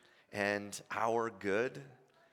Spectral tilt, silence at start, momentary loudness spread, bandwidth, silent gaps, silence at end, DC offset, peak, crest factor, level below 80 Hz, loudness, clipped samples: -4.5 dB/octave; 0.3 s; 9 LU; 17 kHz; none; 0.4 s; under 0.1%; -18 dBFS; 20 dB; -82 dBFS; -36 LUFS; under 0.1%